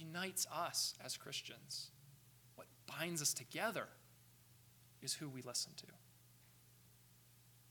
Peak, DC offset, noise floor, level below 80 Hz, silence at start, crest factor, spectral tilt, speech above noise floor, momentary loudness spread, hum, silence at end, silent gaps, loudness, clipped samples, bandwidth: -26 dBFS; under 0.1%; -68 dBFS; -84 dBFS; 0 s; 22 dB; -2 dB/octave; 23 dB; 24 LU; 60 Hz at -70 dBFS; 0 s; none; -43 LUFS; under 0.1%; 19 kHz